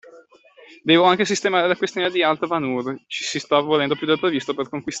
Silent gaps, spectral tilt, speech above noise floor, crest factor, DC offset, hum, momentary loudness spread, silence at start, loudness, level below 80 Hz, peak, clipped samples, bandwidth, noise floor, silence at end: none; -4 dB/octave; 30 dB; 18 dB; under 0.1%; none; 11 LU; 0.05 s; -20 LUFS; -64 dBFS; -4 dBFS; under 0.1%; 8.4 kHz; -50 dBFS; 0 s